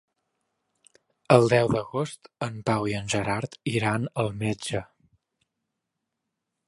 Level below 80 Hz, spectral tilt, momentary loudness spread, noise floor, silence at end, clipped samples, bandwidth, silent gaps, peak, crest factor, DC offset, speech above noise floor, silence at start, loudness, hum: -56 dBFS; -5.5 dB/octave; 13 LU; -83 dBFS; 1.85 s; under 0.1%; 11.5 kHz; none; -4 dBFS; 24 dB; under 0.1%; 58 dB; 1.3 s; -26 LUFS; none